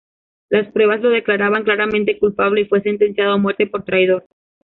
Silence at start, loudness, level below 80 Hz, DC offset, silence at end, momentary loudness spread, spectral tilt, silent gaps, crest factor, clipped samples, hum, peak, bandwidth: 0.5 s; -16 LUFS; -54 dBFS; under 0.1%; 0.45 s; 3 LU; -8.5 dB/octave; none; 14 dB; under 0.1%; none; -2 dBFS; 4.1 kHz